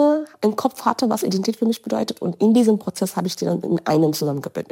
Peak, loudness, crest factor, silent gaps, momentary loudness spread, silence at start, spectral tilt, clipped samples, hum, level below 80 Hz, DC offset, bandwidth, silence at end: -2 dBFS; -21 LUFS; 18 dB; none; 7 LU; 0 s; -6 dB/octave; under 0.1%; none; -72 dBFS; under 0.1%; 17 kHz; 0.1 s